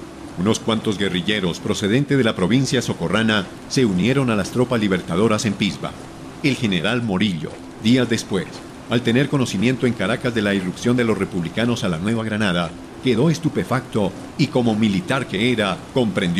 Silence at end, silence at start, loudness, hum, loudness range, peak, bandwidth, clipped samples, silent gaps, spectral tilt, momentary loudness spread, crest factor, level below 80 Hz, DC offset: 0 s; 0 s; -20 LUFS; none; 2 LU; -6 dBFS; 14 kHz; under 0.1%; none; -5.5 dB/octave; 6 LU; 14 dB; -46 dBFS; under 0.1%